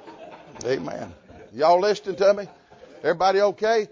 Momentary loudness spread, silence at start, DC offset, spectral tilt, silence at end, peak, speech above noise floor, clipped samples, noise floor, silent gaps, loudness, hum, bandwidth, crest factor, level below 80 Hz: 22 LU; 0.05 s; under 0.1%; -4.5 dB/octave; 0.05 s; -8 dBFS; 22 dB; under 0.1%; -43 dBFS; none; -22 LUFS; none; 7.6 kHz; 16 dB; -62 dBFS